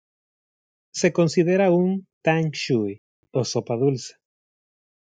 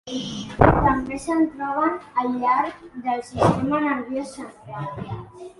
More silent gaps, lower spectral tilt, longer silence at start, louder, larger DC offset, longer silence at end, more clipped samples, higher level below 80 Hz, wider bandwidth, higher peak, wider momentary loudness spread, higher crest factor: first, 2.13-2.21 s, 2.98-3.23 s vs none; about the same, -6 dB/octave vs -6.5 dB/octave; first, 0.95 s vs 0.05 s; about the same, -22 LUFS vs -22 LUFS; neither; first, 0.9 s vs 0.1 s; neither; second, -70 dBFS vs -38 dBFS; second, 9.2 kHz vs 11.5 kHz; second, -6 dBFS vs 0 dBFS; second, 13 LU vs 16 LU; about the same, 18 dB vs 22 dB